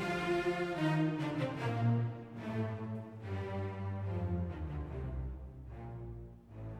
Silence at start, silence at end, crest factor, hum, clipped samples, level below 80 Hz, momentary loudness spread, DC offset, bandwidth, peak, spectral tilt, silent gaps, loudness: 0 s; 0 s; 16 dB; none; under 0.1%; -50 dBFS; 15 LU; under 0.1%; 11.5 kHz; -22 dBFS; -7.5 dB/octave; none; -38 LUFS